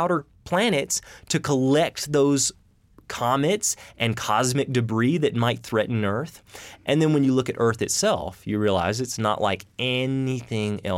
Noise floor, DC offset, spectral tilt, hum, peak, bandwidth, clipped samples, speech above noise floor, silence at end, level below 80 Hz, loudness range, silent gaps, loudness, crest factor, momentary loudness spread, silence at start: -52 dBFS; under 0.1%; -4.5 dB/octave; none; -6 dBFS; 17 kHz; under 0.1%; 29 dB; 0 s; -56 dBFS; 1 LU; none; -23 LUFS; 16 dB; 7 LU; 0 s